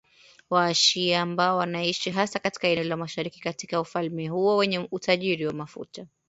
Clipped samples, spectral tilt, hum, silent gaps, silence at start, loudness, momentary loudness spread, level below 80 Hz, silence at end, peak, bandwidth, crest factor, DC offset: under 0.1%; -3.5 dB/octave; none; none; 0.5 s; -25 LUFS; 12 LU; -68 dBFS; 0.2 s; -6 dBFS; 8 kHz; 20 dB; under 0.1%